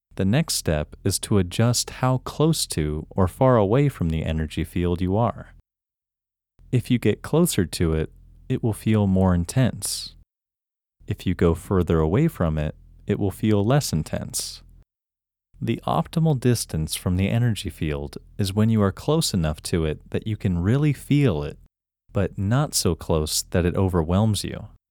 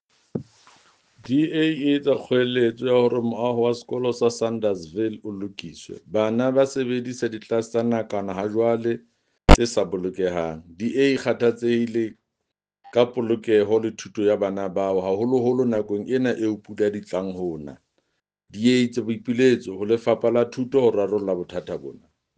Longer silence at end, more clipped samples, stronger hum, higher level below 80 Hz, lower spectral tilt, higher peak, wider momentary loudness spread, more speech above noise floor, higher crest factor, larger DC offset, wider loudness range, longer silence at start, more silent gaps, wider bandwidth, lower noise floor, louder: second, 0.25 s vs 0.45 s; neither; neither; about the same, -40 dBFS vs -36 dBFS; about the same, -5.5 dB/octave vs -6 dB/octave; second, -4 dBFS vs 0 dBFS; second, 8 LU vs 12 LU; first, 67 dB vs 60 dB; about the same, 18 dB vs 22 dB; neither; about the same, 3 LU vs 3 LU; second, 0.15 s vs 0.35 s; neither; first, 19 kHz vs 9.6 kHz; first, -89 dBFS vs -82 dBFS; about the same, -23 LUFS vs -23 LUFS